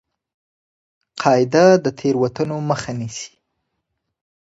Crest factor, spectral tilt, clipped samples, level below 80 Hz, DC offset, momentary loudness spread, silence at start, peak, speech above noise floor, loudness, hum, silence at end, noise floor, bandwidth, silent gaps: 20 dB; -6 dB/octave; under 0.1%; -58 dBFS; under 0.1%; 18 LU; 1.15 s; 0 dBFS; 59 dB; -18 LUFS; none; 1.15 s; -76 dBFS; 8 kHz; none